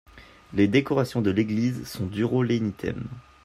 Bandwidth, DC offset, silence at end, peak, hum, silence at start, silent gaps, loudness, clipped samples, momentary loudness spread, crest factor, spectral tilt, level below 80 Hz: 15.5 kHz; under 0.1%; 0.25 s; -8 dBFS; none; 0.15 s; none; -25 LUFS; under 0.1%; 11 LU; 18 dB; -7 dB/octave; -54 dBFS